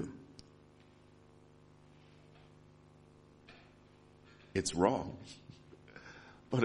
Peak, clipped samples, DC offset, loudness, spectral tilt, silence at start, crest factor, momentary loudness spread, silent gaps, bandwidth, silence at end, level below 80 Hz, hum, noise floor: -12 dBFS; under 0.1%; under 0.1%; -36 LUFS; -5 dB/octave; 0 s; 28 dB; 29 LU; none; 11 kHz; 0 s; -66 dBFS; 50 Hz at -65 dBFS; -62 dBFS